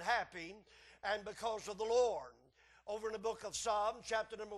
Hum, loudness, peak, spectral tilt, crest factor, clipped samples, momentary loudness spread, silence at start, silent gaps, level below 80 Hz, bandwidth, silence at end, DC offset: none; -39 LUFS; -22 dBFS; -2 dB/octave; 18 dB; under 0.1%; 15 LU; 0 s; none; -70 dBFS; 12.5 kHz; 0 s; under 0.1%